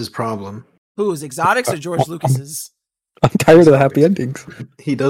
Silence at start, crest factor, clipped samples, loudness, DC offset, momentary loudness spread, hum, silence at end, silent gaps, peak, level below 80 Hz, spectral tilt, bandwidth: 0 s; 16 dB; under 0.1%; -15 LUFS; under 0.1%; 21 LU; none; 0 s; 0.78-0.95 s; 0 dBFS; -50 dBFS; -6 dB/octave; 16.5 kHz